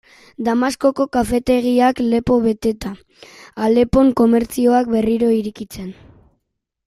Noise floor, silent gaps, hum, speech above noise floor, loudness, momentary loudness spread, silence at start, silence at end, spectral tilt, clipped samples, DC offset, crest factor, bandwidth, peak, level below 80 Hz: -74 dBFS; none; none; 58 dB; -16 LUFS; 17 LU; 0.4 s; 0.95 s; -6 dB/octave; under 0.1%; under 0.1%; 16 dB; 14.5 kHz; -2 dBFS; -40 dBFS